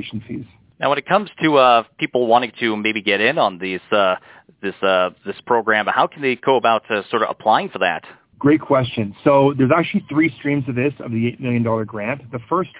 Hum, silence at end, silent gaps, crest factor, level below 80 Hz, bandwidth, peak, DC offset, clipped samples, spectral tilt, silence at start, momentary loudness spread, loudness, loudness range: none; 0 s; none; 18 dB; -56 dBFS; 4 kHz; -2 dBFS; under 0.1%; under 0.1%; -9.5 dB/octave; 0 s; 11 LU; -18 LUFS; 2 LU